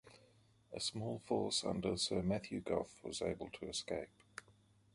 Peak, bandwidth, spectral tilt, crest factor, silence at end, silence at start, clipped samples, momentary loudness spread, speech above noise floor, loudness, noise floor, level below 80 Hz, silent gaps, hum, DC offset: -22 dBFS; 11.5 kHz; -4 dB/octave; 20 dB; 0.45 s; 0.05 s; under 0.1%; 15 LU; 29 dB; -40 LUFS; -69 dBFS; -64 dBFS; none; none; under 0.1%